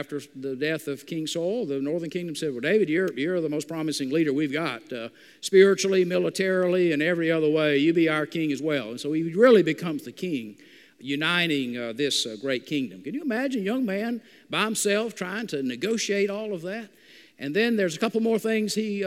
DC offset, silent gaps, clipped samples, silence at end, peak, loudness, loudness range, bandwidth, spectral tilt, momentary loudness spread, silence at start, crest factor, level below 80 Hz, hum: under 0.1%; none; under 0.1%; 0 s; -6 dBFS; -25 LUFS; 5 LU; 16 kHz; -4.5 dB/octave; 11 LU; 0 s; 20 dB; -78 dBFS; none